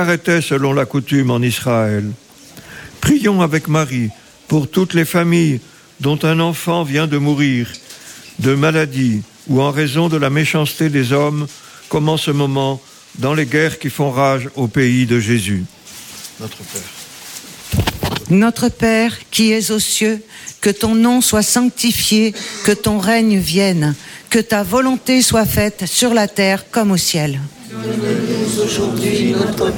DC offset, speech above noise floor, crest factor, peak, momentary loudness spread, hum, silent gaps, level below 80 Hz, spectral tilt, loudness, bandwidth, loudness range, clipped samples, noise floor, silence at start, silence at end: under 0.1%; 24 dB; 14 dB; -2 dBFS; 14 LU; none; none; -42 dBFS; -4.5 dB/octave; -15 LUFS; 17.5 kHz; 4 LU; under 0.1%; -39 dBFS; 0 s; 0 s